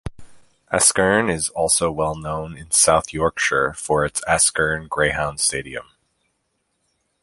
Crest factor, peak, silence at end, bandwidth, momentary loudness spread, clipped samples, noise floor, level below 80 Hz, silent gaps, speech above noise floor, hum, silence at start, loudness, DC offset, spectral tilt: 20 dB; 0 dBFS; 1.4 s; 12 kHz; 13 LU; under 0.1%; -71 dBFS; -44 dBFS; none; 51 dB; none; 0.05 s; -19 LUFS; under 0.1%; -2.5 dB/octave